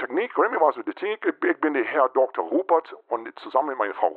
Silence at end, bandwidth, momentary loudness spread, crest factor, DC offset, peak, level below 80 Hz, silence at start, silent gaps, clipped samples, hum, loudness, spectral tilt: 0 s; 4.6 kHz; 9 LU; 18 dB; under 0.1%; -6 dBFS; -88 dBFS; 0 s; none; under 0.1%; none; -24 LUFS; -7 dB/octave